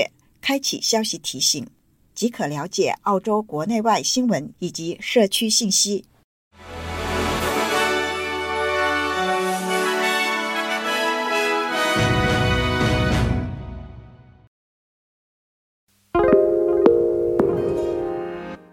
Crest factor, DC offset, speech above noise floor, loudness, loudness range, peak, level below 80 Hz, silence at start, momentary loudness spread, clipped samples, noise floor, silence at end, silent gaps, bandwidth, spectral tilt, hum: 22 dB; under 0.1%; 23 dB; -21 LUFS; 3 LU; 0 dBFS; -38 dBFS; 0 s; 11 LU; under 0.1%; -44 dBFS; 0.15 s; 6.24-6.51 s, 14.47-15.87 s; 17 kHz; -3.5 dB/octave; none